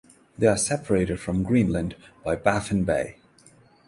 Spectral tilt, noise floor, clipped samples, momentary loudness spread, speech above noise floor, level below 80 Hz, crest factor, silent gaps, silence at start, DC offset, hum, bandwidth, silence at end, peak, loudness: -5.5 dB/octave; -55 dBFS; under 0.1%; 9 LU; 32 dB; -44 dBFS; 22 dB; none; 0.4 s; under 0.1%; none; 11.5 kHz; 0.75 s; -4 dBFS; -24 LUFS